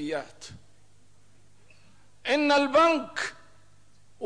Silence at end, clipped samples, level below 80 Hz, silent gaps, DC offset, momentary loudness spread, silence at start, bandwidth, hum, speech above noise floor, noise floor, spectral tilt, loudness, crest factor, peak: 0 s; under 0.1%; -66 dBFS; none; 0.3%; 23 LU; 0 s; 10.5 kHz; 50 Hz at -65 dBFS; 37 dB; -62 dBFS; -3.5 dB/octave; -25 LUFS; 18 dB; -12 dBFS